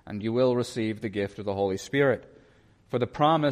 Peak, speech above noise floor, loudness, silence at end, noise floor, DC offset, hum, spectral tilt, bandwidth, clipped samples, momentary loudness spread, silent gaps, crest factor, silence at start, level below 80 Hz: -10 dBFS; 33 dB; -27 LUFS; 0 s; -59 dBFS; under 0.1%; none; -6.5 dB/octave; 14.5 kHz; under 0.1%; 8 LU; none; 16 dB; 0.05 s; -60 dBFS